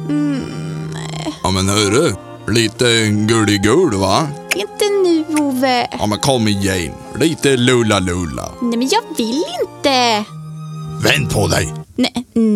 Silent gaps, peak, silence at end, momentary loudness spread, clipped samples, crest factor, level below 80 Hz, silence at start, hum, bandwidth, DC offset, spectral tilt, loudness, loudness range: none; 0 dBFS; 0 s; 11 LU; under 0.1%; 16 dB; -42 dBFS; 0 s; none; 16.5 kHz; under 0.1%; -4.5 dB/octave; -16 LUFS; 3 LU